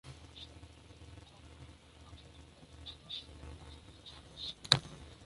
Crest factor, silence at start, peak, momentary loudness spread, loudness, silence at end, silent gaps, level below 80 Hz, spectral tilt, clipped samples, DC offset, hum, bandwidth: 42 dB; 0.05 s; -2 dBFS; 26 LU; -35 LUFS; 0 s; none; -58 dBFS; -2.5 dB/octave; under 0.1%; under 0.1%; none; 11.5 kHz